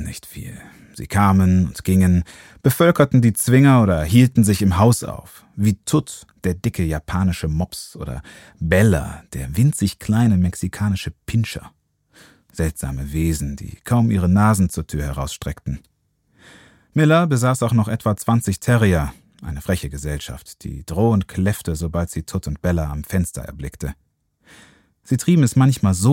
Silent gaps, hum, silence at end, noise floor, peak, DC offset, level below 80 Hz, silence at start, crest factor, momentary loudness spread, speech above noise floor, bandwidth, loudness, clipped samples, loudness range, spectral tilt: none; none; 0 s; -61 dBFS; -2 dBFS; under 0.1%; -36 dBFS; 0 s; 18 dB; 17 LU; 43 dB; 17 kHz; -19 LUFS; under 0.1%; 8 LU; -6.5 dB/octave